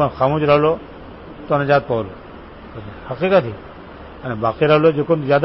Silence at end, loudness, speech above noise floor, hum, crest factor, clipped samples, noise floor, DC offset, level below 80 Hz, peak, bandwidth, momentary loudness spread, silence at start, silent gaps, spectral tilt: 0 s; -17 LUFS; 20 dB; none; 16 dB; under 0.1%; -37 dBFS; under 0.1%; -44 dBFS; -2 dBFS; 5.8 kHz; 23 LU; 0 s; none; -11 dB/octave